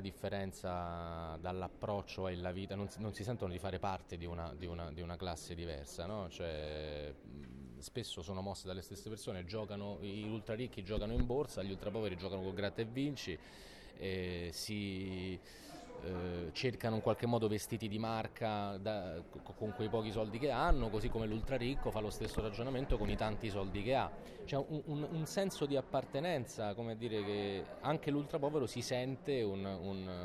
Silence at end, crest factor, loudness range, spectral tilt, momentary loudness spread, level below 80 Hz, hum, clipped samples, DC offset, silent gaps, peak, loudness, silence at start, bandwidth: 0 s; 20 dB; 6 LU; -6 dB/octave; 9 LU; -50 dBFS; none; under 0.1%; under 0.1%; none; -18 dBFS; -41 LUFS; 0 s; 14 kHz